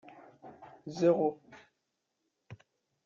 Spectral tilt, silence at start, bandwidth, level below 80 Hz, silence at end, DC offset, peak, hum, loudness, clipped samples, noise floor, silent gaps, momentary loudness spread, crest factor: -7.5 dB/octave; 0.45 s; 7.4 kHz; -78 dBFS; 0.5 s; under 0.1%; -14 dBFS; none; -30 LUFS; under 0.1%; -83 dBFS; none; 27 LU; 22 dB